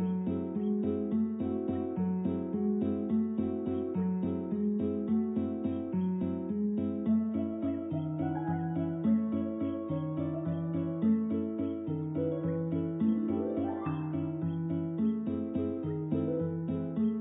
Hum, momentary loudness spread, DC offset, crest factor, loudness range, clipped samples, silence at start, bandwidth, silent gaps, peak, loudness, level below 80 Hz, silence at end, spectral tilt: none; 4 LU; under 0.1%; 12 dB; 1 LU; under 0.1%; 0 s; 3.9 kHz; none; -18 dBFS; -33 LUFS; -54 dBFS; 0 s; -12.5 dB/octave